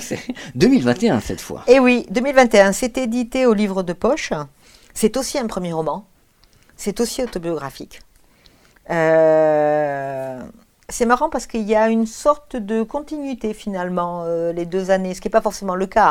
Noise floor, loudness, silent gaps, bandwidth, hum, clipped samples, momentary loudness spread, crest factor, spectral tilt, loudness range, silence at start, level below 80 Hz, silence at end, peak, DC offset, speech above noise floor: -54 dBFS; -19 LUFS; none; 17.5 kHz; none; under 0.1%; 14 LU; 18 dB; -5 dB/octave; 8 LU; 0 s; -44 dBFS; 0 s; 0 dBFS; under 0.1%; 36 dB